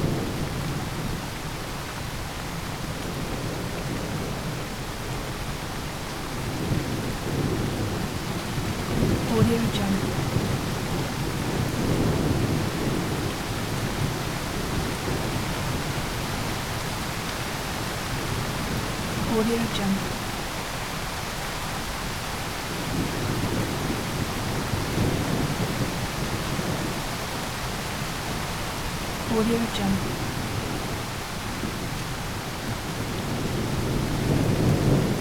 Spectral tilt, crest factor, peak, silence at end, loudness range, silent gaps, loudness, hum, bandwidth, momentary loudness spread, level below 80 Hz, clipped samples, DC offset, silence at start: -5 dB/octave; 18 dB; -8 dBFS; 0 s; 5 LU; none; -28 LUFS; none; 19 kHz; 7 LU; -38 dBFS; under 0.1%; 0.3%; 0 s